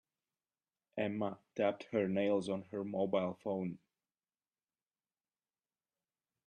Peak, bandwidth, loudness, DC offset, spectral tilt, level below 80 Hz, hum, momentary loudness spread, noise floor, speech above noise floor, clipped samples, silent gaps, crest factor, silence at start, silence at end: -20 dBFS; 9.8 kHz; -37 LUFS; under 0.1%; -7 dB/octave; -82 dBFS; none; 7 LU; under -90 dBFS; over 53 dB; under 0.1%; none; 20 dB; 0.95 s; 2.7 s